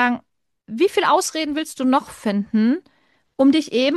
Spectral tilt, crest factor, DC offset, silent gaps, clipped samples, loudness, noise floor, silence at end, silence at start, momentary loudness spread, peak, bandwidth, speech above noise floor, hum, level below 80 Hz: -4 dB/octave; 16 dB; under 0.1%; none; under 0.1%; -20 LUFS; -53 dBFS; 0 s; 0 s; 10 LU; -4 dBFS; 12.5 kHz; 34 dB; none; -64 dBFS